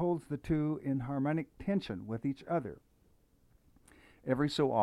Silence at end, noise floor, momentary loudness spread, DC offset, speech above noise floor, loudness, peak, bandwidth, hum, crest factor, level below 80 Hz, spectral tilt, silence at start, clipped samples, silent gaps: 0 s; -68 dBFS; 8 LU; under 0.1%; 34 dB; -35 LUFS; -18 dBFS; 12.5 kHz; none; 18 dB; -58 dBFS; -7.5 dB/octave; 0 s; under 0.1%; none